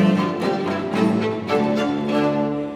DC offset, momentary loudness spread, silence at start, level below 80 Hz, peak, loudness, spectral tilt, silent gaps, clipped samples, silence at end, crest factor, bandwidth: under 0.1%; 3 LU; 0 s; -56 dBFS; -6 dBFS; -21 LUFS; -7 dB/octave; none; under 0.1%; 0 s; 14 dB; 12 kHz